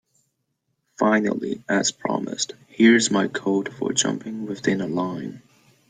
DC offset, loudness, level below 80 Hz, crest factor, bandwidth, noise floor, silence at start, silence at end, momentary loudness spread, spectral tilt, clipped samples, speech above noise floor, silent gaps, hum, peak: under 0.1%; -22 LUFS; -66 dBFS; 20 dB; 9.6 kHz; -75 dBFS; 1 s; 0.5 s; 12 LU; -3.5 dB/octave; under 0.1%; 53 dB; none; none; -4 dBFS